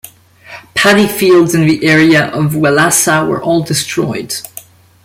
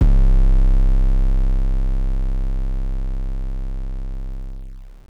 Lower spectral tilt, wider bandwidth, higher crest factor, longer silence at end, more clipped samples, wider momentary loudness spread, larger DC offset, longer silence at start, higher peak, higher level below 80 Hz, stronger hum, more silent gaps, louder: second, -4 dB/octave vs -9 dB/octave; first, 16.5 kHz vs 2.3 kHz; about the same, 12 dB vs 8 dB; first, 0.45 s vs 0.2 s; neither; second, 10 LU vs 16 LU; neither; about the same, 0.05 s vs 0 s; first, 0 dBFS vs -10 dBFS; second, -48 dBFS vs -16 dBFS; neither; neither; first, -10 LUFS vs -23 LUFS